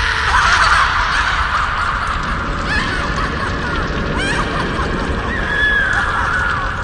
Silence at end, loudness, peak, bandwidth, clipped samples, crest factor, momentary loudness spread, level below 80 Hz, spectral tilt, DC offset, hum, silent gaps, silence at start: 0 s; -16 LUFS; 0 dBFS; 11.5 kHz; under 0.1%; 16 dB; 8 LU; -26 dBFS; -4 dB/octave; under 0.1%; none; none; 0 s